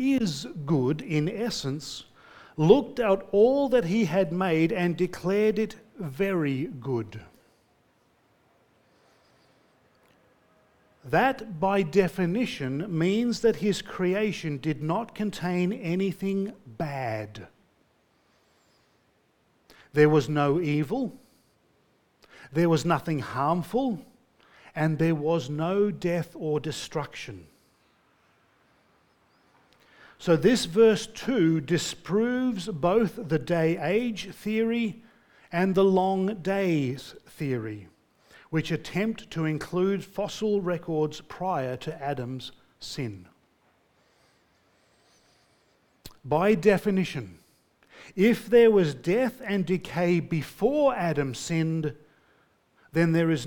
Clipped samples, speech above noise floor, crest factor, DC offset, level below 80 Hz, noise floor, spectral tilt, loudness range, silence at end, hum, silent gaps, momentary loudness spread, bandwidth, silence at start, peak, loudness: under 0.1%; 42 dB; 22 dB; under 0.1%; -58 dBFS; -67 dBFS; -6.5 dB/octave; 11 LU; 0 s; none; none; 13 LU; 18.5 kHz; 0 s; -4 dBFS; -26 LUFS